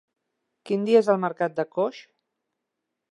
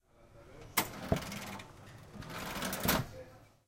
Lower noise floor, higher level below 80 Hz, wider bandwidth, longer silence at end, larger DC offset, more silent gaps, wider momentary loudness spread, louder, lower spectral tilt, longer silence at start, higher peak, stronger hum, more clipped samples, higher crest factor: first, -83 dBFS vs -59 dBFS; second, -80 dBFS vs -54 dBFS; second, 11 kHz vs 17 kHz; first, 1.1 s vs 0.2 s; neither; neither; second, 9 LU vs 21 LU; first, -24 LUFS vs -36 LUFS; first, -7 dB/octave vs -3.5 dB/octave; first, 0.65 s vs 0.2 s; first, -6 dBFS vs -14 dBFS; neither; neither; second, 20 dB vs 26 dB